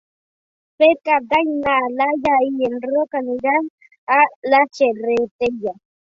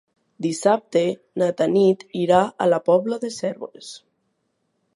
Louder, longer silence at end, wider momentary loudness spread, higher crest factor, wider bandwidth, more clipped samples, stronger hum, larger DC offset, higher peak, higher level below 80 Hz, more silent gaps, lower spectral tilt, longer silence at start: first, -18 LUFS vs -21 LUFS; second, 0.4 s vs 1 s; second, 7 LU vs 13 LU; about the same, 16 dB vs 18 dB; second, 7.6 kHz vs 11.5 kHz; neither; neither; neither; about the same, -2 dBFS vs -2 dBFS; first, -58 dBFS vs -66 dBFS; first, 3.70-3.78 s, 3.98-4.07 s, 4.36-4.42 s, 5.31-5.39 s vs none; about the same, -5 dB/octave vs -5.5 dB/octave; first, 0.8 s vs 0.4 s